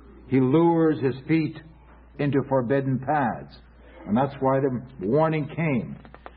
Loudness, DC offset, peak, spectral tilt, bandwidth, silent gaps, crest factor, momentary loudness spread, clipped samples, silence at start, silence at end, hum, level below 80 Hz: -24 LUFS; under 0.1%; -10 dBFS; -12.5 dB/octave; 5 kHz; none; 14 dB; 11 LU; under 0.1%; 0.05 s; 0.1 s; none; -52 dBFS